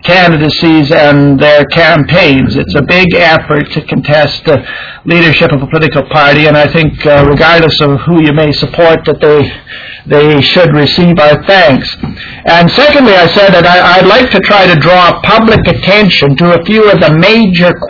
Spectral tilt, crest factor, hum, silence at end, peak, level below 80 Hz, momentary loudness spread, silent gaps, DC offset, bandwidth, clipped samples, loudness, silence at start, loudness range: -7 dB/octave; 6 dB; none; 0 s; 0 dBFS; -30 dBFS; 7 LU; none; 0.3%; 5.4 kHz; 7%; -5 LUFS; 0.05 s; 3 LU